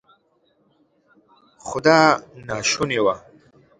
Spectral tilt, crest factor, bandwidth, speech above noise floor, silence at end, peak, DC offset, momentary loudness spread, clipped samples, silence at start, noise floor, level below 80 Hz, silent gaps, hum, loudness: -3.5 dB/octave; 22 dB; 11 kHz; 45 dB; 0.6 s; 0 dBFS; under 0.1%; 17 LU; under 0.1%; 1.65 s; -64 dBFS; -58 dBFS; none; none; -19 LUFS